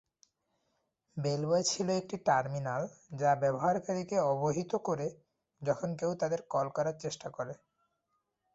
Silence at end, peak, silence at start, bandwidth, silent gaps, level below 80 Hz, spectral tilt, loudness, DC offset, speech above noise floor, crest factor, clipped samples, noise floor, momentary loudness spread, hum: 1 s; -14 dBFS; 1.15 s; 8.2 kHz; none; -72 dBFS; -5 dB/octave; -33 LUFS; under 0.1%; 49 dB; 20 dB; under 0.1%; -81 dBFS; 11 LU; none